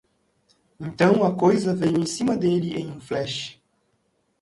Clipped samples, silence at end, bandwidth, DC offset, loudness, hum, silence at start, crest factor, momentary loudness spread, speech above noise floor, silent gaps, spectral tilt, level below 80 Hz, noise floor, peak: under 0.1%; 0.9 s; 11.5 kHz; under 0.1%; -22 LUFS; none; 0.8 s; 18 dB; 13 LU; 48 dB; none; -6 dB/octave; -60 dBFS; -70 dBFS; -6 dBFS